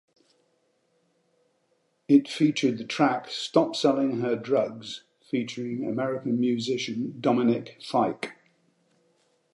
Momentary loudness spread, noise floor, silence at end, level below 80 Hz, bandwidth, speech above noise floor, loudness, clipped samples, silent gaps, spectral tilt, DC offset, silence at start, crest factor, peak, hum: 10 LU; -71 dBFS; 1.2 s; -78 dBFS; 11.5 kHz; 46 dB; -26 LUFS; under 0.1%; none; -5.5 dB/octave; under 0.1%; 2.1 s; 20 dB; -8 dBFS; none